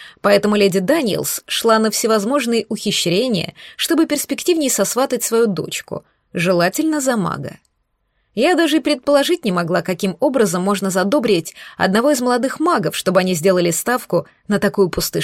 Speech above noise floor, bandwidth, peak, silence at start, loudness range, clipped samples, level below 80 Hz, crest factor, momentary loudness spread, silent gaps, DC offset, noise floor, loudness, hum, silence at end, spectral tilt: 51 dB; 16.5 kHz; 0 dBFS; 0 s; 2 LU; under 0.1%; -52 dBFS; 16 dB; 7 LU; none; under 0.1%; -68 dBFS; -17 LUFS; none; 0 s; -4 dB/octave